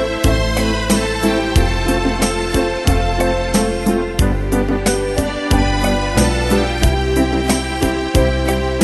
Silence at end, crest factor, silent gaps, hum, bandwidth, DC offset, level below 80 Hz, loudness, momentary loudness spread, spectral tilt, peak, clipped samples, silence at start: 0 s; 16 dB; none; none; 12.5 kHz; under 0.1%; -20 dBFS; -17 LUFS; 2 LU; -5 dB/octave; 0 dBFS; under 0.1%; 0 s